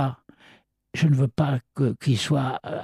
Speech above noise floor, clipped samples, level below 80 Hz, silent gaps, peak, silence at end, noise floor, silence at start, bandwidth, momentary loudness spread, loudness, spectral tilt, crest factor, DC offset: 34 dB; under 0.1%; -58 dBFS; none; -10 dBFS; 0 s; -57 dBFS; 0 s; 11.5 kHz; 8 LU; -24 LUFS; -6.5 dB/octave; 14 dB; under 0.1%